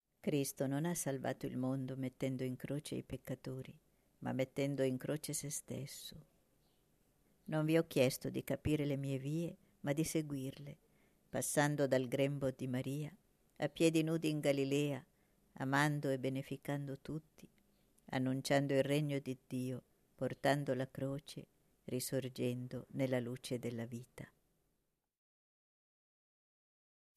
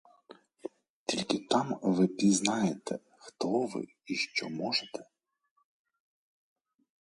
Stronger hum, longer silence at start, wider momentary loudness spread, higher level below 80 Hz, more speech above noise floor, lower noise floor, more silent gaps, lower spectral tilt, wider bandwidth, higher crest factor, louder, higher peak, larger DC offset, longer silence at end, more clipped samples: neither; about the same, 0.25 s vs 0.3 s; second, 13 LU vs 18 LU; first, -70 dBFS vs -76 dBFS; about the same, 46 dB vs 48 dB; first, -85 dBFS vs -79 dBFS; second, none vs 0.89-1.06 s; first, -5.5 dB/octave vs -4 dB/octave; first, 14 kHz vs 11.5 kHz; about the same, 20 dB vs 24 dB; second, -39 LUFS vs -31 LUFS; second, -18 dBFS vs -10 dBFS; neither; first, 2.9 s vs 2 s; neither